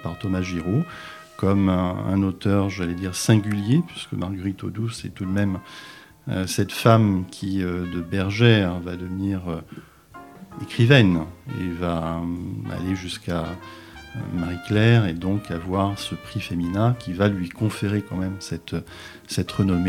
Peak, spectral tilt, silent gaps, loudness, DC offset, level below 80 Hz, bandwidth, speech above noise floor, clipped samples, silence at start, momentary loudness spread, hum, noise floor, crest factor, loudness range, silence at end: 0 dBFS; -6.5 dB/octave; none; -23 LUFS; under 0.1%; -48 dBFS; 15.5 kHz; 22 dB; under 0.1%; 0 s; 16 LU; none; -45 dBFS; 22 dB; 4 LU; 0 s